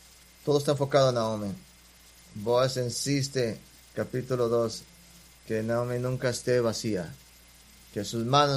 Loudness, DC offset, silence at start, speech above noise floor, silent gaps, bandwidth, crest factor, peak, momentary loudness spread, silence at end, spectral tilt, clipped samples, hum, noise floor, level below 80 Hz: -28 LUFS; under 0.1%; 0.45 s; 28 dB; none; 15.5 kHz; 22 dB; -8 dBFS; 14 LU; 0 s; -5 dB/octave; under 0.1%; none; -55 dBFS; -58 dBFS